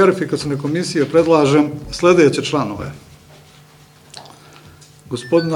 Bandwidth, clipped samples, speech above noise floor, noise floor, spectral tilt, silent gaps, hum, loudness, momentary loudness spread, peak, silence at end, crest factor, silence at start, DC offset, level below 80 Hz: 14 kHz; under 0.1%; 31 dB; -46 dBFS; -6 dB/octave; none; none; -16 LUFS; 18 LU; 0 dBFS; 0 s; 16 dB; 0 s; under 0.1%; -48 dBFS